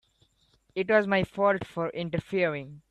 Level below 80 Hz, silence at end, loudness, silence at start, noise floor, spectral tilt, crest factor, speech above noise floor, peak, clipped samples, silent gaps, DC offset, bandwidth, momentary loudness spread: -60 dBFS; 0.1 s; -28 LUFS; 0.75 s; -67 dBFS; -7 dB/octave; 18 dB; 40 dB; -10 dBFS; under 0.1%; none; under 0.1%; 11.5 kHz; 10 LU